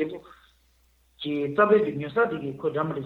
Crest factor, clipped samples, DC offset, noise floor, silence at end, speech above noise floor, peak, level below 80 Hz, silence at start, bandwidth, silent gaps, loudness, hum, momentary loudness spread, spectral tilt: 20 dB; under 0.1%; under 0.1%; -63 dBFS; 0 s; 39 dB; -8 dBFS; -64 dBFS; 0 s; 4.4 kHz; none; -25 LUFS; none; 13 LU; -8 dB/octave